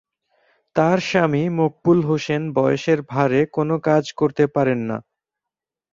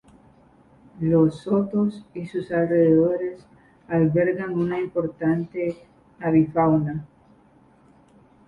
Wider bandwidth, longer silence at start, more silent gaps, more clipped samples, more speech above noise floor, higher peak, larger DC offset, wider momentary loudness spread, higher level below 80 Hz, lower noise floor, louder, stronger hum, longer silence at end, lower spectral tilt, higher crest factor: second, 7.6 kHz vs 8.8 kHz; second, 0.75 s vs 0.95 s; neither; neither; first, 68 dB vs 34 dB; first, -2 dBFS vs -8 dBFS; neither; second, 4 LU vs 11 LU; about the same, -58 dBFS vs -56 dBFS; first, -87 dBFS vs -55 dBFS; about the same, -20 LUFS vs -22 LUFS; neither; second, 0.9 s vs 1.4 s; second, -7 dB/octave vs -10 dB/octave; about the same, 18 dB vs 16 dB